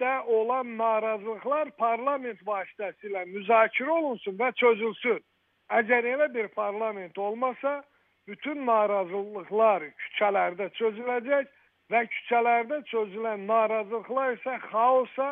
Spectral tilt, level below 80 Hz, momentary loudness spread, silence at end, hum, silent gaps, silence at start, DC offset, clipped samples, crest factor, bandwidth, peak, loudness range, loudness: -7.5 dB/octave; -88 dBFS; 10 LU; 0 s; none; none; 0 s; under 0.1%; under 0.1%; 20 dB; 3.8 kHz; -8 dBFS; 3 LU; -27 LUFS